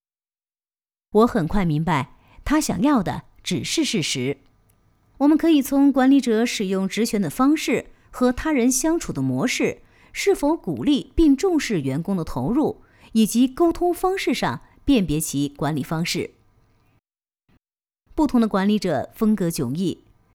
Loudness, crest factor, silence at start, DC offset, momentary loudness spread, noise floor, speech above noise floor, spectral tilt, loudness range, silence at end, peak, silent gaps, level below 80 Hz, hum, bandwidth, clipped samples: -21 LUFS; 16 dB; 1.15 s; under 0.1%; 9 LU; under -90 dBFS; over 70 dB; -5 dB/octave; 5 LU; 0.4 s; -6 dBFS; none; -42 dBFS; none; 18.5 kHz; under 0.1%